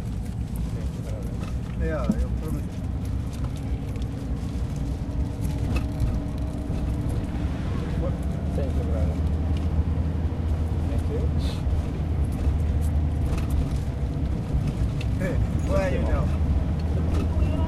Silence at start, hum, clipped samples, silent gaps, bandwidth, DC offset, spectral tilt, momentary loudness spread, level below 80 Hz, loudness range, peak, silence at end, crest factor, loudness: 0 s; none; under 0.1%; none; 12.5 kHz; under 0.1%; -8 dB/octave; 6 LU; -28 dBFS; 3 LU; -10 dBFS; 0 s; 14 dB; -27 LUFS